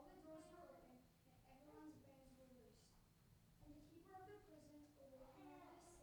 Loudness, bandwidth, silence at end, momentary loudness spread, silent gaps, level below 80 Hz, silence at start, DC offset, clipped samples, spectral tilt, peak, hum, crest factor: -65 LUFS; over 20 kHz; 0 s; 7 LU; none; -78 dBFS; 0 s; under 0.1%; under 0.1%; -5.5 dB/octave; -50 dBFS; none; 16 dB